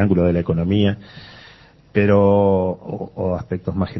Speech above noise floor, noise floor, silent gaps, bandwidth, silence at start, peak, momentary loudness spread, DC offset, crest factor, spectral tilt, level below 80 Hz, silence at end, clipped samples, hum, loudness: 29 dB; -47 dBFS; none; 6 kHz; 0 s; -2 dBFS; 15 LU; under 0.1%; 16 dB; -10 dB/octave; -36 dBFS; 0 s; under 0.1%; none; -19 LUFS